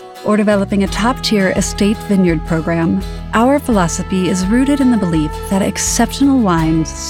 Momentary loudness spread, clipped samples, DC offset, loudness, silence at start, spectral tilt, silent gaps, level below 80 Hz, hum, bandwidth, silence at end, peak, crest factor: 4 LU; under 0.1%; under 0.1%; -14 LUFS; 0 s; -5 dB/octave; none; -28 dBFS; none; 16.5 kHz; 0 s; 0 dBFS; 14 dB